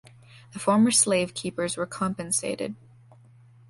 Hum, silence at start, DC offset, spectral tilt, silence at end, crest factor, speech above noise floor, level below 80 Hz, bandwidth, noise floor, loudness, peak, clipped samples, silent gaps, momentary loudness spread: none; 0.35 s; under 0.1%; -3.5 dB/octave; 0.95 s; 20 dB; 28 dB; -62 dBFS; 11.5 kHz; -53 dBFS; -25 LUFS; -8 dBFS; under 0.1%; none; 15 LU